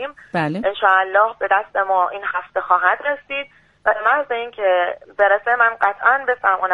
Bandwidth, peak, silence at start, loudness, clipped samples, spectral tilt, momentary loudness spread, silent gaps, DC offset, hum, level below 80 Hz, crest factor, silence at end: 5 kHz; 0 dBFS; 0 s; -18 LUFS; under 0.1%; -6.5 dB/octave; 9 LU; none; under 0.1%; none; -60 dBFS; 18 dB; 0 s